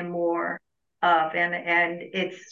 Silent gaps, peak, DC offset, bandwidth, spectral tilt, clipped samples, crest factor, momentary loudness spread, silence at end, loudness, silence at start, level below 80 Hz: none; -10 dBFS; under 0.1%; 7.4 kHz; -5.5 dB/octave; under 0.1%; 16 dB; 8 LU; 0.1 s; -25 LUFS; 0 s; -82 dBFS